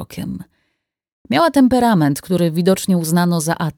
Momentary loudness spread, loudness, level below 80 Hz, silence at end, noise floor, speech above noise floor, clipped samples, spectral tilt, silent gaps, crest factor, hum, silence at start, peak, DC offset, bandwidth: 15 LU; -16 LUFS; -48 dBFS; 0.05 s; -72 dBFS; 56 dB; under 0.1%; -6 dB/octave; 1.12-1.25 s; 14 dB; none; 0 s; -2 dBFS; under 0.1%; 19 kHz